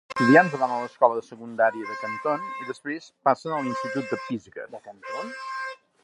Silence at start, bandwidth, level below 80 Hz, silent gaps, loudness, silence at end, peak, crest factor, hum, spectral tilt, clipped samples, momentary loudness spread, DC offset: 0.1 s; 11 kHz; -74 dBFS; none; -25 LUFS; 0.3 s; -2 dBFS; 24 dB; none; -6 dB/octave; under 0.1%; 18 LU; under 0.1%